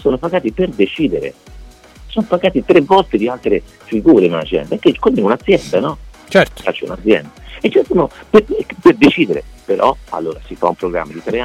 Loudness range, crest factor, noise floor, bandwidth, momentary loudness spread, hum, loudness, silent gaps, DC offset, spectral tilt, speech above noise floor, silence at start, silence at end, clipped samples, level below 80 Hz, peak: 2 LU; 14 dB; -37 dBFS; 12.5 kHz; 12 LU; none; -15 LUFS; none; under 0.1%; -6.5 dB/octave; 23 dB; 0 s; 0 s; under 0.1%; -38 dBFS; 0 dBFS